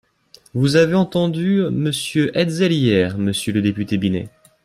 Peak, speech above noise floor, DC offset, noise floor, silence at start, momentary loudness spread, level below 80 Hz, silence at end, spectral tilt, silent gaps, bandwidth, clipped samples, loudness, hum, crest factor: -2 dBFS; 34 dB; under 0.1%; -51 dBFS; 0.55 s; 6 LU; -54 dBFS; 0.35 s; -6 dB/octave; none; 14.5 kHz; under 0.1%; -18 LUFS; none; 16 dB